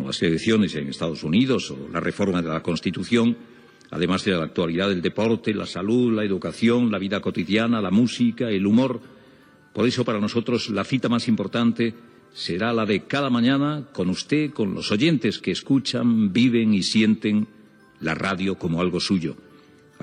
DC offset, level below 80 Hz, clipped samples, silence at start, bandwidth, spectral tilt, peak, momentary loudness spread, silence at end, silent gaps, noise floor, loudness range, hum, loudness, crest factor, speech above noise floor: under 0.1%; -62 dBFS; under 0.1%; 0 s; 10.5 kHz; -6 dB/octave; -8 dBFS; 7 LU; 0.65 s; none; -52 dBFS; 3 LU; none; -22 LUFS; 14 dB; 30 dB